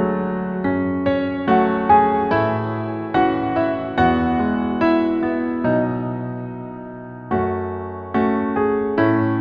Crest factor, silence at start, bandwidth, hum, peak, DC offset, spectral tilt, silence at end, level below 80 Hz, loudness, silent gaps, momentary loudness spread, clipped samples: 18 dB; 0 s; 5.6 kHz; none; -2 dBFS; under 0.1%; -9.5 dB/octave; 0 s; -46 dBFS; -20 LUFS; none; 10 LU; under 0.1%